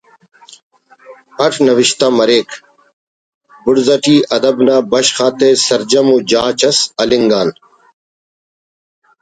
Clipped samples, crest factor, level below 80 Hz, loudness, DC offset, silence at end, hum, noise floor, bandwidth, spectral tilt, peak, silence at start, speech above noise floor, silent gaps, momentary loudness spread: under 0.1%; 14 dB; -54 dBFS; -11 LUFS; under 0.1%; 1.7 s; none; -40 dBFS; 9.4 kHz; -3.5 dB/octave; 0 dBFS; 1.1 s; 29 dB; 2.93-3.41 s; 5 LU